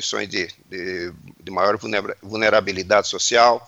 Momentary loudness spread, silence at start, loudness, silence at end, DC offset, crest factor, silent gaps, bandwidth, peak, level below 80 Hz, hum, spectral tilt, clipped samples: 13 LU; 0 s; -20 LUFS; 0.05 s; under 0.1%; 20 dB; none; 15 kHz; -2 dBFS; -58 dBFS; none; -2.5 dB/octave; under 0.1%